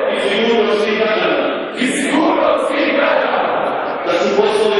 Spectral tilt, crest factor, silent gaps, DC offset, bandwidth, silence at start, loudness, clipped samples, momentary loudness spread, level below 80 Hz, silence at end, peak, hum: -3.5 dB/octave; 14 dB; none; under 0.1%; 11.5 kHz; 0 s; -15 LUFS; under 0.1%; 4 LU; -56 dBFS; 0 s; -2 dBFS; none